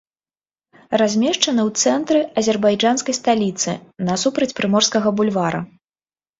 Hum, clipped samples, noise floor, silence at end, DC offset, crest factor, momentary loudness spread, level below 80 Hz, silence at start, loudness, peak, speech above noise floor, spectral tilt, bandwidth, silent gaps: none; under 0.1%; under -90 dBFS; 0.75 s; under 0.1%; 18 dB; 7 LU; -60 dBFS; 0.9 s; -18 LUFS; -2 dBFS; over 72 dB; -3.5 dB/octave; 8 kHz; none